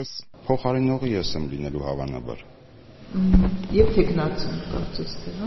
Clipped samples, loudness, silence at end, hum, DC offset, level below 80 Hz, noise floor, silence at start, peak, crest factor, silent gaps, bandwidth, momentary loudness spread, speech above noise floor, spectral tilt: under 0.1%; -25 LUFS; 0 s; none; under 0.1%; -32 dBFS; -46 dBFS; 0 s; -2 dBFS; 22 dB; none; 6.2 kHz; 14 LU; 23 dB; -6.5 dB/octave